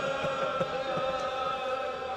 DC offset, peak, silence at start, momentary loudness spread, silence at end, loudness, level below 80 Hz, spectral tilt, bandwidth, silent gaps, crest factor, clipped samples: under 0.1%; -16 dBFS; 0 s; 2 LU; 0 s; -31 LUFS; -60 dBFS; -4.5 dB/octave; 11.5 kHz; none; 16 dB; under 0.1%